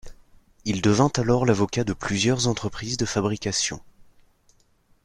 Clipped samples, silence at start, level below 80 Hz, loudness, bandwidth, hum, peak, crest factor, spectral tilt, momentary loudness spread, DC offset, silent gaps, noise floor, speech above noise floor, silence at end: under 0.1%; 0.05 s; -48 dBFS; -23 LUFS; 12 kHz; none; -6 dBFS; 20 dB; -4.5 dB/octave; 9 LU; under 0.1%; none; -61 dBFS; 38 dB; 1.2 s